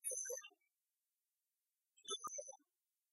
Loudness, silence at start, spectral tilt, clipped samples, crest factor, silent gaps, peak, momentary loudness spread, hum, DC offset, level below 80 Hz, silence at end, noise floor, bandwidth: -47 LUFS; 0.05 s; 2 dB/octave; under 0.1%; 22 dB; none; -30 dBFS; 17 LU; none; under 0.1%; under -90 dBFS; 0.55 s; under -90 dBFS; 12.5 kHz